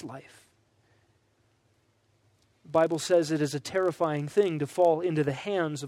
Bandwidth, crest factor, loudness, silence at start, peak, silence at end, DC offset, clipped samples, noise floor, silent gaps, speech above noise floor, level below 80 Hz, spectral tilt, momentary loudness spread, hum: 15.5 kHz; 18 dB; -27 LUFS; 0 s; -10 dBFS; 0 s; under 0.1%; under 0.1%; -69 dBFS; none; 42 dB; -72 dBFS; -5.5 dB/octave; 5 LU; none